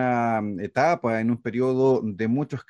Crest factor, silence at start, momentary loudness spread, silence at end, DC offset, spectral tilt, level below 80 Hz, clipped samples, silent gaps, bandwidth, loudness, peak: 16 dB; 0 s; 4 LU; 0.1 s; under 0.1%; -8 dB/octave; -66 dBFS; under 0.1%; none; 9.4 kHz; -24 LUFS; -8 dBFS